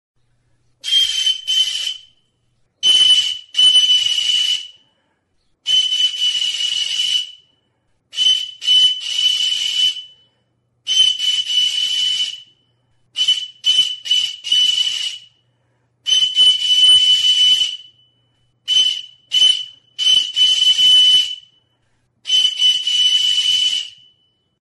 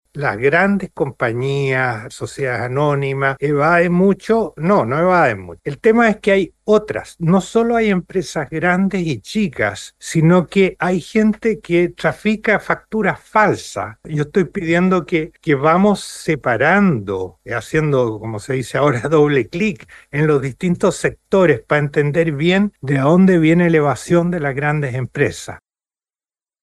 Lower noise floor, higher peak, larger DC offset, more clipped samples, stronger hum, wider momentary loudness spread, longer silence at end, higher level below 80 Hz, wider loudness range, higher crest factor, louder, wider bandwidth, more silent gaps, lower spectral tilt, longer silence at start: second, -65 dBFS vs under -90 dBFS; about the same, -4 dBFS vs -2 dBFS; neither; neither; neither; first, 15 LU vs 9 LU; second, 0.8 s vs 1.05 s; second, -66 dBFS vs -48 dBFS; about the same, 4 LU vs 3 LU; about the same, 12 dB vs 14 dB; first, -13 LUFS vs -17 LUFS; about the same, 11.5 kHz vs 12.5 kHz; neither; second, 3.5 dB/octave vs -6.5 dB/octave; first, 0.85 s vs 0.15 s